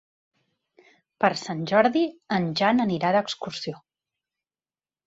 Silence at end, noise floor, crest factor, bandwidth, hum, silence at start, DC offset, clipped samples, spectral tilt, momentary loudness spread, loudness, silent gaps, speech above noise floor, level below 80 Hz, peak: 1.3 s; under -90 dBFS; 22 dB; 8 kHz; none; 1.2 s; under 0.1%; under 0.1%; -5.5 dB/octave; 12 LU; -24 LUFS; none; over 66 dB; -68 dBFS; -4 dBFS